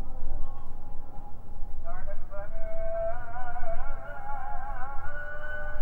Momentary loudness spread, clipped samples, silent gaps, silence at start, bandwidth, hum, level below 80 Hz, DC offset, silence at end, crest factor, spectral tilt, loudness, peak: 11 LU; under 0.1%; none; 0 s; 2.3 kHz; none; -30 dBFS; under 0.1%; 0 s; 10 dB; -8 dB/octave; -39 LUFS; -12 dBFS